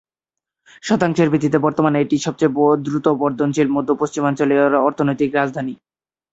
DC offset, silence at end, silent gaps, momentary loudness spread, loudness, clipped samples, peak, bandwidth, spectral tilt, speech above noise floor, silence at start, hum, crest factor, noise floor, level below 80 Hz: under 0.1%; 0.6 s; none; 5 LU; -18 LUFS; under 0.1%; -2 dBFS; 8 kHz; -6.5 dB/octave; 68 dB; 0.85 s; none; 16 dB; -86 dBFS; -58 dBFS